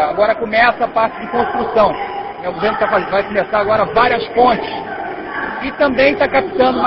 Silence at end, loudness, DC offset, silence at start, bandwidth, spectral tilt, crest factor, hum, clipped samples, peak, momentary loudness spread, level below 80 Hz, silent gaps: 0 s; -15 LUFS; under 0.1%; 0 s; 5.8 kHz; -9.5 dB/octave; 16 dB; none; under 0.1%; 0 dBFS; 11 LU; -44 dBFS; none